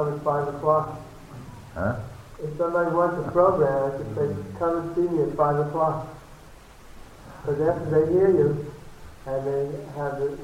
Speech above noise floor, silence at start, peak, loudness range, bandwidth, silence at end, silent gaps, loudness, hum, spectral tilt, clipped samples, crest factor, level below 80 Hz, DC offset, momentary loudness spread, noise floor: 23 dB; 0 s; -8 dBFS; 3 LU; 15.5 kHz; 0 s; none; -24 LUFS; none; -8.5 dB/octave; under 0.1%; 18 dB; -50 dBFS; under 0.1%; 20 LU; -47 dBFS